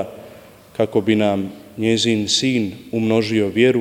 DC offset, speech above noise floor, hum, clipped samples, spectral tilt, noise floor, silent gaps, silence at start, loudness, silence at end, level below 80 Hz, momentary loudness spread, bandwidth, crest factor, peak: under 0.1%; 25 dB; none; under 0.1%; -4.5 dB/octave; -43 dBFS; none; 0 s; -18 LUFS; 0 s; -58 dBFS; 13 LU; 16 kHz; 16 dB; -2 dBFS